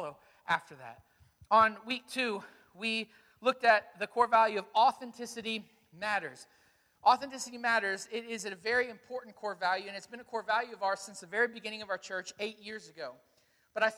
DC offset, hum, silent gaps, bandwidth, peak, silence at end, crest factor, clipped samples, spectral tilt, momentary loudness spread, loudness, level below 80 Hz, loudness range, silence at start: under 0.1%; none; none; 18 kHz; -12 dBFS; 0 s; 22 dB; under 0.1%; -2.5 dB/octave; 17 LU; -32 LUFS; -76 dBFS; 6 LU; 0 s